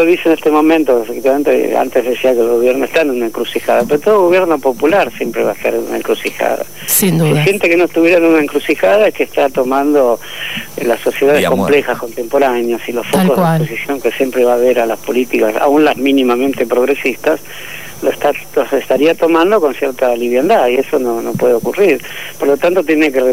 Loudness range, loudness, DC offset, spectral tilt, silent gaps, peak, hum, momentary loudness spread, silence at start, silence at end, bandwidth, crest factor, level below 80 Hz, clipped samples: 2 LU; -13 LUFS; 2%; -5 dB/octave; none; -2 dBFS; none; 7 LU; 0 s; 0 s; 16.5 kHz; 12 dB; -52 dBFS; under 0.1%